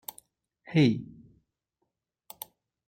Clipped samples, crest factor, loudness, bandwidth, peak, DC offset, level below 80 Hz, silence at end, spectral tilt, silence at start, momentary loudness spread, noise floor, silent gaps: under 0.1%; 22 dB; -27 LUFS; 16.5 kHz; -10 dBFS; under 0.1%; -66 dBFS; 1.8 s; -6.5 dB/octave; 0.7 s; 21 LU; -82 dBFS; none